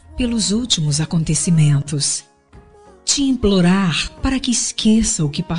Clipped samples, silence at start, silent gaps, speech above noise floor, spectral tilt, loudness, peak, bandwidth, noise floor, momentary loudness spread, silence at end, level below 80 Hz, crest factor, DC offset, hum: under 0.1%; 0.05 s; none; 29 dB; -4.5 dB/octave; -17 LUFS; -2 dBFS; 11 kHz; -46 dBFS; 6 LU; 0 s; -34 dBFS; 16 dB; 0.7%; none